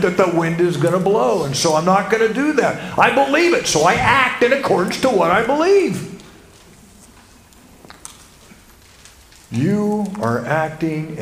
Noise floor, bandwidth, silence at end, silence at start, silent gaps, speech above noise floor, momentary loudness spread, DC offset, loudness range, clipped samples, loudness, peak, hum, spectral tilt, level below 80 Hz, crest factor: -46 dBFS; 16 kHz; 0 s; 0 s; none; 30 dB; 9 LU; under 0.1%; 11 LU; under 0.1%; -16 LUFS; 0 dBFS; none; -4.5 dB/octave; -48 dBFS; 18 dB